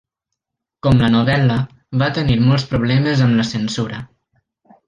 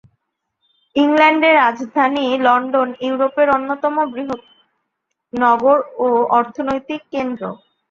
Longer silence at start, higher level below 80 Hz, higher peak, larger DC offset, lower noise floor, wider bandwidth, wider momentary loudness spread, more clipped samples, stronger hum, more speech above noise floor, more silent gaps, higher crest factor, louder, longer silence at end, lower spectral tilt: about the same, 0.85 s vs 0.95 s; first, -40 dBFS vs -60 dBFS; about the same, -2 dBFS vs -2 dBFS; neither; first, -80 dBFS vs -75 dBFS; first, 9.2 kHz vs 7.2 kHz; second, 9 LU vs 13 LU; neither; neither; first, 65 dB vs 59 dB; neither; about the same, 14 dB vs 16 dB; about the same, -17 LUFS vs -16 LUFS; first, 0.85 s vs 0.35 s; first, -7 dB/octave vs -5.5 dB/octave